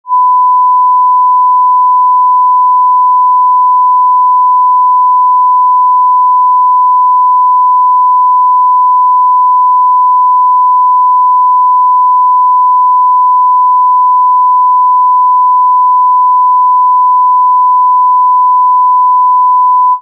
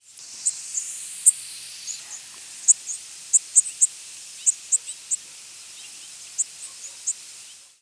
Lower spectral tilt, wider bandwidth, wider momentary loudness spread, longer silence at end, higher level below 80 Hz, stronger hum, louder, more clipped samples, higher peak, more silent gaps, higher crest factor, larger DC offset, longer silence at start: second, 9 dB/octave vs 4 dB/octave; second, 1.1 kHz vs 11 kHz; second, 0 LU vs 21 LU; second, 0 s vs 0.25 s; second, under -90 dBFS vs -82 dBFS; neither; first, -6 LUFS vs -22 LUFS; neither; about the same, -4 dBFS vs -2 dBFS; neither; second, 4 dB vs 26 dB; neither; about the same, 0.05 s vs 0.15 s